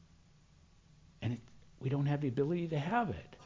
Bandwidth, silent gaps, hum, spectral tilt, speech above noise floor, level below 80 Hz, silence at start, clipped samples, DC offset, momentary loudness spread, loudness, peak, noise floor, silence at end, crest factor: 7.6 kHz; none; none; -8.5 dB/octave; 29 dB; -62 dBFS; 1.2 s; under 0.1%; under 0.1%; 9 LU; -36 LUFS; -18 dBFS; -64 dBFS; 0 s; 20 dB